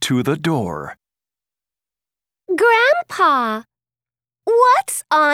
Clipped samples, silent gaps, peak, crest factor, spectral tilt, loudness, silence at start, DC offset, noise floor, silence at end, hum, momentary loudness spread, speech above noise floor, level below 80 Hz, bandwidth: under 0.1%; none; -2 dBFS; 16 dB; -4 dB/octave; -16 LUFS; 0 s; under 0.1%; under -90 dBFS; 0 s; none; 15 LU; over 74 dB; -60 dBFS; 16.5 kHz